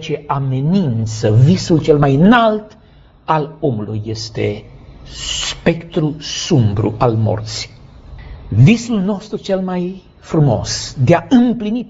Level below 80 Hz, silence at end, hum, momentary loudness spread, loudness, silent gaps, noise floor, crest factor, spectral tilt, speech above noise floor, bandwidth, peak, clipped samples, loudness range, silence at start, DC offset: -38 dBFS; 0 s; none; 13 LU; -15 LUFS; none; -40 dBFS; 16 dB; -6 dB/octave; 25 dB; 8 kHz; 0 dBFS; under 0.1%; 6 LU; 0 s; under 0.1%